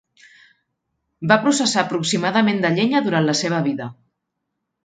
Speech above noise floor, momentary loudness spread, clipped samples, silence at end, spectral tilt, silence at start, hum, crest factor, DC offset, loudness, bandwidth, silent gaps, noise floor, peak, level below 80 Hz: 59 dB; 8 LU; under 0.1%; 0.95 s; -4.5 dB/octave; 1.2 s; none; 20 dB; under 0.1%; -19 LUFS; 9.4 kHz; none; -78 dBFS; 0 dBFS; -66 dBFS